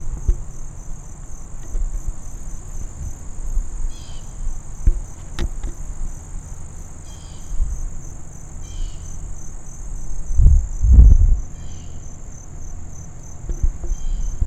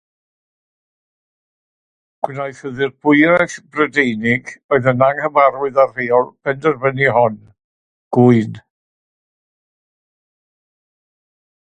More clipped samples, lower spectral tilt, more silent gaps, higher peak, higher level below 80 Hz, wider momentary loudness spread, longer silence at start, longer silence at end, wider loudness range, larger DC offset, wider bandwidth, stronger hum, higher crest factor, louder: neither; about the same, -6 dB/octave vs -7 dB/octave; second, none vs 4.64-4.69 s, 7.64-8.11 s; about the same, 0 dBFS vs 0 dBFS; first, -20 dBFS vs -58 dBFS; first, 20 LU vs 11 LU; second, 0 s vs 2.25 s; second, 0 s vs 3.05 s; first, 15 LU vs 6 LU; neither; about the same, 8.8 kHz vs 9.4 kHz; neither; about the same, 20 dB vs 18 dB; second, -23 LUFS vs -16 LUFS